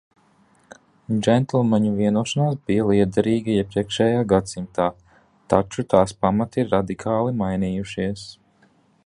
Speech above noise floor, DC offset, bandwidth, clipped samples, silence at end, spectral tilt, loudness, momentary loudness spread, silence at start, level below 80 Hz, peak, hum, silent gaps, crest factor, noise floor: 38 dB; under 0.1%; 11 kHz; under 0.1%; 0.75 s; -6.5 dB/octave; -21 LUFS; 7 LU; 1.1 s; -48 dBFS; 0 dBFS; none; none; 20 dB; -59 dBFS